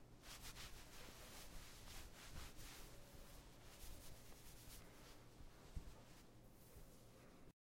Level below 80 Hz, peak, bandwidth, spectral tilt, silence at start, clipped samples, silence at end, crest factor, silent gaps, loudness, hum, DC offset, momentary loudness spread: -62 dBFS; -36 dBFS; 16.5 kHz; -3 dB/octave; 0 s; under 0.1%; 0.15 s; 22 dB; none; -60 LUFS; none; under 0.1%; 8 LU